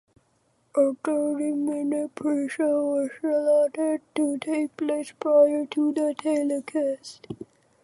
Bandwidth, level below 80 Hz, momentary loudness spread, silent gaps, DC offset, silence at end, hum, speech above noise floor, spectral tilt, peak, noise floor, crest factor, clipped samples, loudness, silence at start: 11.5 kHz; -74 dBFS; 7 LU; none; under 0.1%; 0.4 s; none; 43 dB; -5 dB/octave; -8 dBFS; -67 dBFS; 16 dB; under 0.1%; -25 LUFS; 0.75 s